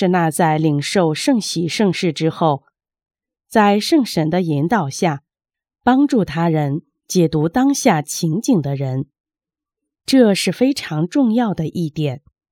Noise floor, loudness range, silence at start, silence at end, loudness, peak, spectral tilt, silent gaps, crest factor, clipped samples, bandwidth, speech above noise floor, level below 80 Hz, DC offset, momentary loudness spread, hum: -89 dBFS; 2 LU; 0 s; 0.35 s; -17 LUFS; 0 dBFS; -5.5 dB/octave; 9.20-9.24 s; 18 dB; under 0.1%; 17 kHz; 72 dB; -54 dBFS; under 0.1%; 8 LU; none